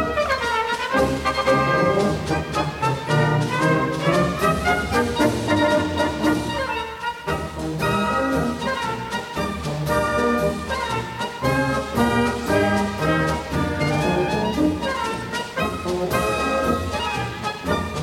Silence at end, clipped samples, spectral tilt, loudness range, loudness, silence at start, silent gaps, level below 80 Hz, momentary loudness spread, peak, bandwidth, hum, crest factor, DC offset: 0 s; under 0.1%; -5.5 dB/octave; 3 LU; -22 LUFS; 0 s; none; -38 dBFS; 7 LU; -6 dBFS; 17 kHz; none; 16 dB; under 0.1%